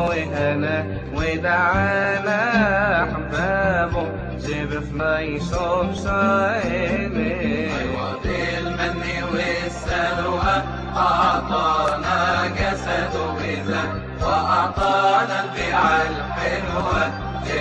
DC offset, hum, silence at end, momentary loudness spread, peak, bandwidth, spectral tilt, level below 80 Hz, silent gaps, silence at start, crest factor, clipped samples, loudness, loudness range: under 0.1%; none; 0 s; 7 LU; -6 dBFS; 10 kHz; -5.5 dB/octave; -36 dBFS; none; 0 s; 16 dB; under 0.1%; -21 LUFS; 3 LU